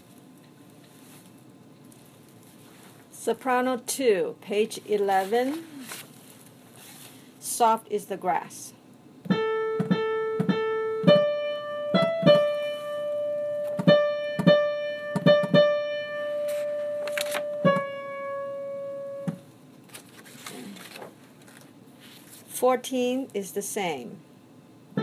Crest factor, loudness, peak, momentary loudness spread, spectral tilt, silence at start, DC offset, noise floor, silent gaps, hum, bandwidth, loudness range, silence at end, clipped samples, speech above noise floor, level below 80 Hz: 22 dB; -26 LUFS; -6 dBFS; 22 LU; -5 dB/octave; 0.95 s; under 0.1%; -52 dBFS; none; none; 16 kHz; 12 LU; 0 s; under 0.1%; 25 dB; -76 dBFS